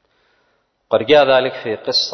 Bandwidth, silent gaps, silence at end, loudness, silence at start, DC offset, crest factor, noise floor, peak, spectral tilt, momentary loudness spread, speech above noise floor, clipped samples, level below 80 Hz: 6.4 kHz; none; 0 s; -15 LUFS; 0.9 s; under 0.1%; 16 dB; -64 dBFS; -2 dBFS; -3.5 dB/octave; 11 LU; 49 dB; under 0.1%; -60 dBFS